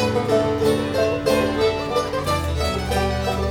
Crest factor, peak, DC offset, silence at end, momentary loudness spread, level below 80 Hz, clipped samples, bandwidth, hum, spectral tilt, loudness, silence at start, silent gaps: 14 dB; -6 dBFS; 0.1%; 0 s; 4 LU; -34 dBFS; under 0.1%; over 20 kHz; none; -5.5 dB/octave; -21 LUFS; 0 s; none